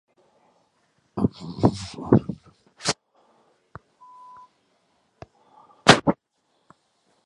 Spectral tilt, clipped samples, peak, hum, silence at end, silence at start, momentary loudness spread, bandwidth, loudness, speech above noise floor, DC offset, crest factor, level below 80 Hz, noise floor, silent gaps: -4.5 dB/octave; under 0.1%; 0 dBFS; none; 1.15 s; 1.15 s; 21 LU; 11.5 kHz; -22 LUFS; 48 dB; under 0.1%; 26 dB; -50 dBFS; -71 dBFS; none